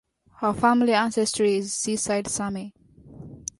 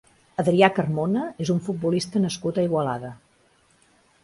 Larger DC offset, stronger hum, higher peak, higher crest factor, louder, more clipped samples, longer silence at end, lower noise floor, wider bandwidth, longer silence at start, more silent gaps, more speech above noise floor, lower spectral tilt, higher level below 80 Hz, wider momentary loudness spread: neither; neither; second, -8 dBFS vs -2 dBFS; about the same, 18 dB vs 22 dB; about the same, -23 LUFS vs -23 LUFS; neither; second, 0.2 s vs 1.1 s; second, -45 dBFS vs -61 dBFS; about the same, 11.5 kHz vs 11.5 kHz; about the same, 0.4 s vs 0.4 s; neither; second, 21 dB vs 38 dB; second, -3.5 dB/octave vs -6 dB/octave; about the same, -56 dBFS vs -60 dBFS; first, 16 LU vs 10 LU